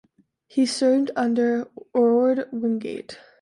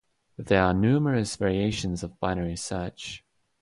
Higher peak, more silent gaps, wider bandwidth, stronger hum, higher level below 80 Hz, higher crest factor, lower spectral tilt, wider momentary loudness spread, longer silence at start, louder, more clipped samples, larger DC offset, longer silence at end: about the same, -10 dBFS vs -8 dBFS; neither; about the same, 11.5 kHz vs 11.5 kHz; neither; second, -72 dBFS vs -46 dBFS; about the same, 14 dB vs 18 dB; second, -4.5 dB/octave vs -6 dB/octave; second, 11 LU vs 16 LU; first, 0.55 s vs 0.4 s; first, -22 LUFS vs -26 LUFS; neither; neither; second, 0.25 s vs 0.45 s